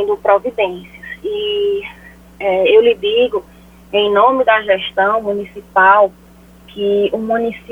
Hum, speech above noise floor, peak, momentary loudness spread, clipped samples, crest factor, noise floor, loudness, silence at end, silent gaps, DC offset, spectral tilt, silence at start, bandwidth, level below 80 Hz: none; 28 dB; 0 dBFS; 13 LU; under 0.1%; 14 dB; -42 dBFS; -14 LUFS; 0.15 s; none; under 0.1%; -5.5 dB/octave; 0 s; 4.2 kHz; -48 dBFS